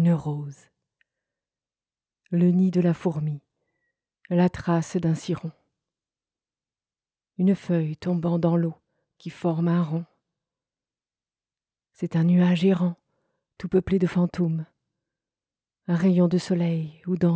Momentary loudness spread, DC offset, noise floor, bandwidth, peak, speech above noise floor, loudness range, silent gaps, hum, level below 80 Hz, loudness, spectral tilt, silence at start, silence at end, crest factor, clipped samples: 16 LU; under 0.1%; under -90 dBFS; 8 kHz; -10 dBFS; over 67 dB; 5 LU; none; none; -58 dBFS; -24 LUFS; -8.5 dB/octave; 0 s; 0 s; 16 dB; under 0.1%